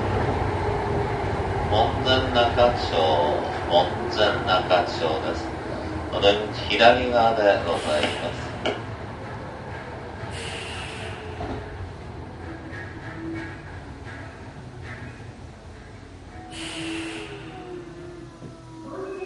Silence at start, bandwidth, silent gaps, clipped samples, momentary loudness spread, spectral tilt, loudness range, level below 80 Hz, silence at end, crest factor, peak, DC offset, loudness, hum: 0 s; 11.5 kHz; none; under 0.1%; 20 LU; -5.5 dB/octave; 15 LU; -40 dBFS; 0 s; 24 dB; -2 dBFS; under 0.1%; -24 LUFS; none